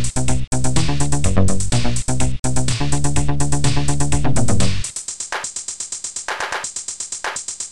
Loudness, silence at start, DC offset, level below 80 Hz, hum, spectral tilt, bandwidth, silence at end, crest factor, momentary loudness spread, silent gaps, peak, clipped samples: -21 LUFS; 0 s; 10%; -28 dBFS; none; -4 dB/octave; 12.5 kHz; 0 s; 14 dB; 7 LU; 0.47-0.51 s, 2.39-2.43 s; -2 dBFS; under 0.1%